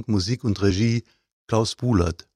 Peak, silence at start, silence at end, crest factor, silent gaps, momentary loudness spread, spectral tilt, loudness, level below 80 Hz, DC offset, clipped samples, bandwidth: -6 dBFS; 0 s; 0.2 s; 16 dB; 1.33-1.48 s; 4 LU; -6 dB/octave; -23 LUFS; -42 dBFS; under 0.1%; under 0.1%; 11 kHz